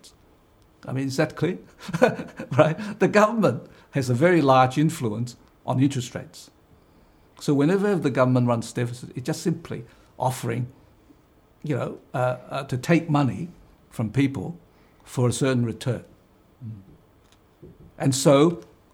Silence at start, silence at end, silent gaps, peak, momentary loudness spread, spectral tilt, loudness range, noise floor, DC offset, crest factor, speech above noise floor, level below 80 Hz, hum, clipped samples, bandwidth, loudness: 0.05 s; 0.3 s; none; -2 dBFS; 18 LU; -6 dB/octave; 8 LU; -57 dBFS; under 0.1%; 22 dB; 34 dB; -60 dBFS; none; under 0.1%; 16.5 kHz; -23 LUFS